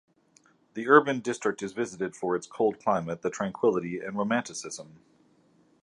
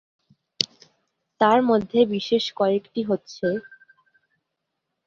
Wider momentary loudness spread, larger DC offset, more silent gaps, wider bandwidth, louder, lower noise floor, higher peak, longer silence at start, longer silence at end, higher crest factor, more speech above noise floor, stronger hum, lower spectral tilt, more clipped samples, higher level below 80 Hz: first, 16 LU vs 8 LU; neither; neither; first, 11 kHz vs 7.8 kHz; second, -28 LUFS vs -23 LUFS; second, -63 dBFS vs -80 dBFS; about the same, -4 dBFS vs -2 dBFS; first, 0.75 s vs 0.6 s; second, 0.95 s vs 1.45 s; about the same, 24 dB vs 24 dB; second, 36 dB vs 59 dB; neither; about the same, -5 dB/octave vs -5 dB/octave; neither; about the same, -70 dBFS vs -66 dBFS